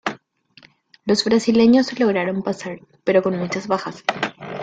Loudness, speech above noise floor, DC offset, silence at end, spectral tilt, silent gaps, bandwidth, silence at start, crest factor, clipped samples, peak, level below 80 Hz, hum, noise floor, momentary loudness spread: -20 LUFS; 33 dB; under 0.1%; 0 s; -5 dB/octave; none; 9 kHz; 0.05 s; 18 dB; under 0.1%; -2 dBFS; -60 dBFS; none; -52 dBFS; 13 LU